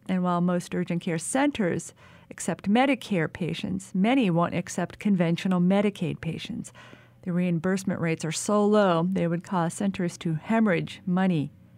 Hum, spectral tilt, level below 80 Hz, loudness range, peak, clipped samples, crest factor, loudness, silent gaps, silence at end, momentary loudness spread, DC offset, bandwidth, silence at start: none; -6 dB/octave; -62 dBFS; 2 LU; -10 dBFS; under 0.1%; 16 dB; -26 LUFS; none; 0.3 s; 9 LU; under 0.1%; 13.5 kHz; 0.1 s